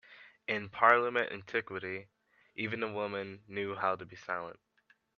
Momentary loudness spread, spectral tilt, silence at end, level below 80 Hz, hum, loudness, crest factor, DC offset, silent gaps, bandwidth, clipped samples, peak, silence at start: 16 LU; -6 dB/octave; 0.65 s; -76 dBFS; none; -33 LUFS; 26 dB; under 0.1%; none; 7 kHz; under 0.1%; -10 dBFS; 0.1 s